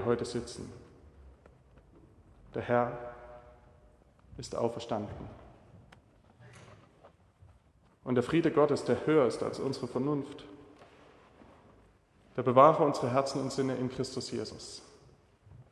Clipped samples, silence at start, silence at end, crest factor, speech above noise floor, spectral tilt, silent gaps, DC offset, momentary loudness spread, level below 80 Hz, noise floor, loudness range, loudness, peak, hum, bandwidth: under 0.1%; 0 s; 0.1 s; 26 dB; 34 dB; -6 dB/octave; none; under 0.1%; 21 LU; -62 dBFS; -64 dBFS; 12 LU; -30 LUFS; -8 dBFS; none; 12 kHz